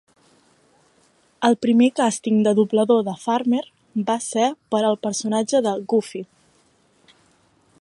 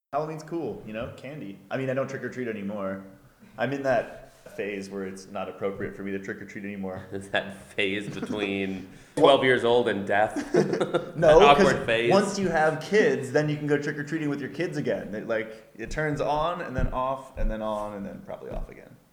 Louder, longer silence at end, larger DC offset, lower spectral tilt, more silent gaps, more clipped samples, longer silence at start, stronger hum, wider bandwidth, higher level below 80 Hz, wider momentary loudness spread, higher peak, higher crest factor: first, -20 LUFS vs -26 LUFS; first, 1.55 s vs 0.2 s; neither; about the same, -5 dB/octave vs -5.5 dB/octave; neither; neither; first, 1.4 s vs 0.1 s; neither; second, 11.5 kHz vs 19 kHz; second, -72 dBFS vs -42 dBFS; second, 7 LU vs 17 LU; about the same, -4 dBFS vs -2 dBFS; second, 18 dB vs 24 dB